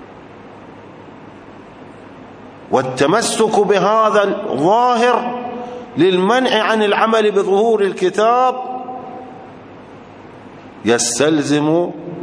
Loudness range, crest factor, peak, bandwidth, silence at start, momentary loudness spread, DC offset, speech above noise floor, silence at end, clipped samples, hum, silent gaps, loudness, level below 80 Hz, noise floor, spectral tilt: 5 LU; 16 dB; 0 dBFS; 11 kHz; 0 s; 14 LU; under 0.1%; 23 dB; 0 s; under 0.1%; none; none; -15 LUFS; -60 dBFS; -37 dBFS; -4 dB/octave